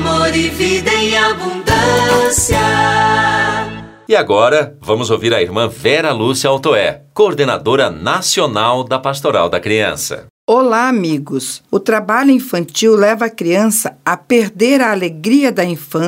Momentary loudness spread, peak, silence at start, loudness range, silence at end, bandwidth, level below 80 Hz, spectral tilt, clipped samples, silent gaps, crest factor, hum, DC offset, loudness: 7 LU; 0 dBFS; 0 s; 2 LU; 0 s; 16.5 kHz; -40 dBFS; -4 dB/octave; under 0.1%; 10.30-10.48 s; 14 dB; none; under 0.1%; -13 LUFS